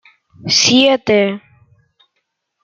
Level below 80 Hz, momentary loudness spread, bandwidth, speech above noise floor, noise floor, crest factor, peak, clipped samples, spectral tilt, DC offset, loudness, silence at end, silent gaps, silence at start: -60 dBFS; 19 LU; 7.6 kHz; 58 dB; -71 dBFS; 16 dB; 0 dBFS; under 0.1%; -3 dB/octave; under 0.1%; -12 LUFS; 1.25 s; none; 0.45 s